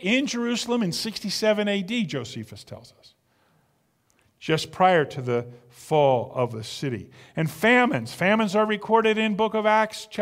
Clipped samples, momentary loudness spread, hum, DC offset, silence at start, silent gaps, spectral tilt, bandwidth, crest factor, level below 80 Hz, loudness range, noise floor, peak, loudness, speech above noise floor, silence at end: under 0.1%; 16 LU; none; under 0.1%; 0 s; none; -5 dB/octave; 16 kHz; 20 dB; -64 dBFS; 7 LU; -68 dBFS; -6 dBFS; -23 LUFS; 44 dB; 0 s